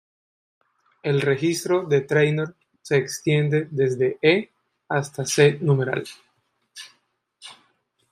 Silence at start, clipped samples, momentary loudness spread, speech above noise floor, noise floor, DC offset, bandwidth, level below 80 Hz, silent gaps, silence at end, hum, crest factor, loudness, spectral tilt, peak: 1.05 s; under 0.1%; 23 LU; 47 dB; -68 dBFS; under 0.1%; 15.5 kHz; -66 dBFS; none; 0.6 s; none; 20 dB; -22 LUFS; -5.5 dB/octave; -4 dBFS